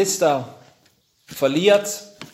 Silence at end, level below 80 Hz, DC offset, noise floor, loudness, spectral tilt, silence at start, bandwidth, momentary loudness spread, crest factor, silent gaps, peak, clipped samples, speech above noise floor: 0.1 s; -68 dBFS; under 0.1%; -61 dBFS; -19 LUFS; -3.5 dB/octave; 0 s; 16 kHz; 19 LU; 20 dB; none; -2 dBFS; under 0.1%; 42 dB